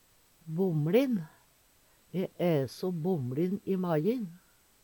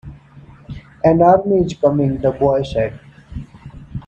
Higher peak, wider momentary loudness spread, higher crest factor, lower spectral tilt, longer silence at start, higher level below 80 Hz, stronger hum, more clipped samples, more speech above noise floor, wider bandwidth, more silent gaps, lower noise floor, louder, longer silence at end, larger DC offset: second, -12 dBFS vs 0 dBFS; second, 11 LU vs 23 LU; about the same, 20 dB vs 16 dB; about the same, -8 dB/octave vs -8.5 dB/octave; first, 0.45 s vs 0.05 s; second, -72 dBFS vs -40 dBFS; neither; neither; first, 35 dB vs 28 dB; first, 19 kHz vs 8.4 kHz; neither; first, -65 dBFS vs -42 dBFS; second, -31 LUFS vs -16 LUFS; first, 0.45 s vs 0.05 s; neither